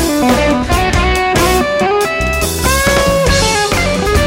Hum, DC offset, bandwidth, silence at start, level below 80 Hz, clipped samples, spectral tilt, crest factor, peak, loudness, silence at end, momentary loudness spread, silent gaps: none; under 0.1%; 16.5 kHz; 0 s; -20 dBFS; under 0.1%; -4 dB/octave; 12 dB; 0 dBFS; -12 LUFS; 0 s; 3 LU; none